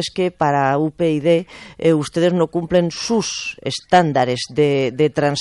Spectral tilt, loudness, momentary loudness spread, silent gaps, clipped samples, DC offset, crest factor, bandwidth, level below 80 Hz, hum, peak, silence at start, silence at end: -5.5 dB/octave; -18 LUFS; 6 LU; none; under 0.1%; under 0.1%; 14 dB; 11.5 kHz; -52 dBFS; none; -4 dBFS; 0 s; 0 s